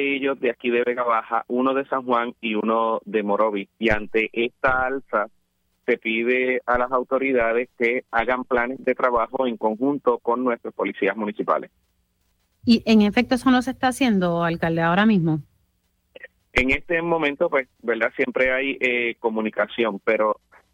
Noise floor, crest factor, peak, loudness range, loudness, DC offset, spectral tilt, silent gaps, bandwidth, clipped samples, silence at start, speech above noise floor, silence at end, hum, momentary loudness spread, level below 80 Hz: -68 dBFS; 18 dB; -4 dBFS; 3 LU; -22 LUFS; under 0.1%; -6 dB/octave; none; 13.5 kHz; under 0.1%; 0 s; 47 dB; 0.4 s; none; 6 LU; -48 dBFS